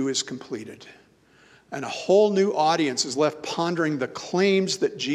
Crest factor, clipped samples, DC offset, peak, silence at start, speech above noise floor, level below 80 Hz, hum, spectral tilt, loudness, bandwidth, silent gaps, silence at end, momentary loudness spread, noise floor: 18 dB; under 0.1%; under 0.1%; -8 dBFS; 0 s; 33 dB; -72 dBFS; none; -4 dB/octave; -23 LUFS; 12 kHz; none; 0 s; 15 LU; -57 dBFS